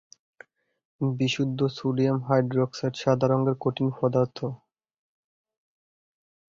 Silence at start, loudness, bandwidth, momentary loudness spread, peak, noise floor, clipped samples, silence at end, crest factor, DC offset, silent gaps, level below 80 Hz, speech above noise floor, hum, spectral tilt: 1 s; -26 LUFS; 7.6 kHz; 7 LU; -8 dBFS; -54 dBFS; under 0.1%; 2 s; 18 dB; under 0.1%; none; -64 dBFS; 30 dB; none; -7 dB/octave